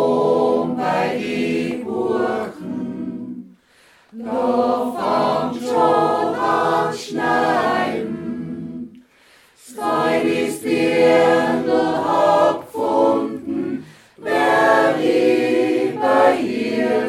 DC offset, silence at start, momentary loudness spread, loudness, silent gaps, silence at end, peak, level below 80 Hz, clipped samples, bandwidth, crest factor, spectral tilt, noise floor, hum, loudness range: under 0.1%; 0 s; 13 LU; -18 LUFS; none; 0 s; -2 dBFS; -62 dBFS; under 0.1%; 15 kHz; 16 dB; -5.5 dB/octave; -53 dBFS; none; 6 LU